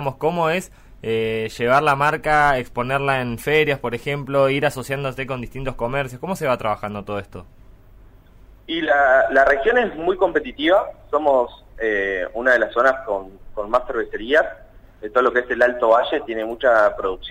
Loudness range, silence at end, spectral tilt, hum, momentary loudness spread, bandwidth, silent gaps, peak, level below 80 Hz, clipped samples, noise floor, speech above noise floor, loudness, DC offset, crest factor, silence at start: 7 LU; 0 s; -5.5 dB/octave; none; 12 LU; 16 kHz; none; -4 dBFS; -42 dBFS; under 0.1%; -46 dBFS; 27 dB; -20 LUFS; under 0.1%; 16 dB; 0 s